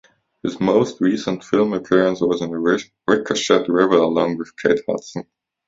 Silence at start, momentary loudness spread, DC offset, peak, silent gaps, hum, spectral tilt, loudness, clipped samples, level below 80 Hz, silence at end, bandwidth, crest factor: 0.45 s; 10 LU; under 0.1%; 0 dBFS; none; none; -5 dB/octave; -19 LUFS; under 0.1%; -58 dBFS; 0.45 s; 7.8 kHz; 18 dB